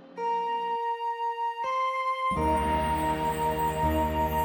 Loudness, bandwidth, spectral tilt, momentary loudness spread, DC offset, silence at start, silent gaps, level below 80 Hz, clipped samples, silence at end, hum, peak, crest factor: -28 LUFS; over 20 kHz; -6 dB/octave; 4 LU; under 0.1%; 0 s; none; -40 dBFS; under 0.1%; 0 s; none; -14 dBFS; 12 dB